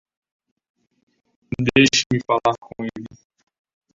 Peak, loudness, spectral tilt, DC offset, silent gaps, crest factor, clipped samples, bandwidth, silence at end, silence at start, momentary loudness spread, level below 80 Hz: -2 dBFS; -19 LUFS; -4 dB/octave; under 0.1%; 2.06-2.10 s; 22 dB; under 0.1%; 7.8 kHz; 0.85 s; 1.5 s; 19 LU; -52 dBFS